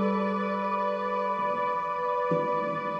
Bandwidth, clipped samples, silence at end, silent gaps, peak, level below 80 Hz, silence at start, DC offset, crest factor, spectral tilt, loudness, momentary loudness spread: 8 kHz; under 0.1%; 0 s; none; -14 dBFS; -70 dBFS; 0 s; under 0.1%; 14 dB; -8 dB/octave; -28 LUFS; 2 LU